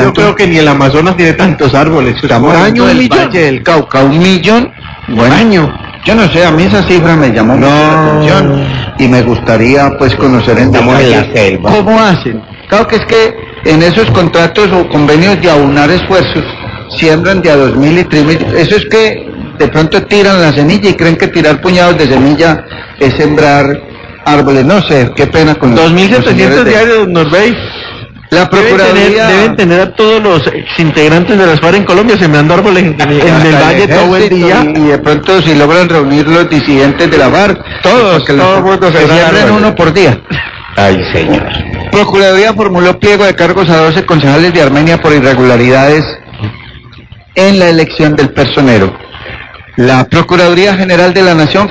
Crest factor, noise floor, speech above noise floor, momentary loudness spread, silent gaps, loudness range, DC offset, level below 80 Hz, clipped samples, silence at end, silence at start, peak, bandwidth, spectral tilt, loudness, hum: 6 dB; -32 dBFS; 26 dB; 6 LU; none; 2 LU; 0.8%; -30 dBFS; 6%; 0 s; 0 s; 0 dBFS; 8 kHz; -6 dB/octave; -6 LUFS; none